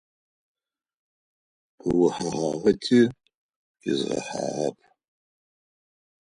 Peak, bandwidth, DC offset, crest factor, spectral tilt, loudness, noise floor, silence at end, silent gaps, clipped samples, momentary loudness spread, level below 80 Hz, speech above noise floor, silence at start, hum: -6 dBFS; 10.5 kHz; under 0.1%; 20 dB; -5.5 dB/octave; -25 LUFS; under -90 dBFS; 1.55 s; 3.35-3.49 s, 3.56-3.74 s; under 0.1%; 10 LU; -60 dBFS; over 67 dB; 1.85 s; none